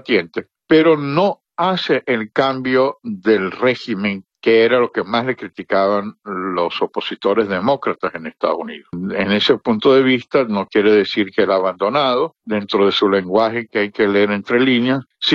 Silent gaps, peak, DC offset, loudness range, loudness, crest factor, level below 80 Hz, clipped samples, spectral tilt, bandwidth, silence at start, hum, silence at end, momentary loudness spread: none; -2 dBFS; under 0.1%; 4 LU; -17 LUFS; 16 dB; -60 dBFS; under 0.1%; -6.5 dB/octave; 7.2 kHz; 0.05 s; none; 0 s; 9 LU